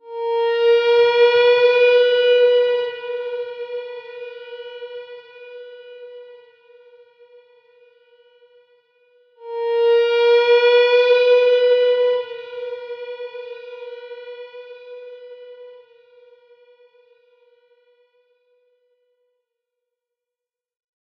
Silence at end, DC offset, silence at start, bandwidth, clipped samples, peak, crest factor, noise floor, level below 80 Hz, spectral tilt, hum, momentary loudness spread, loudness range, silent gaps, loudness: 5.35 s; under 0.1%; 0.05 s; 6 kHz; under 0.1%; -4 dBFS; 16 dB; -88 dBFS; -80 dBFS; -1.5 dB/octave; none; 25 LU; 23 LU; none; -16 LUFS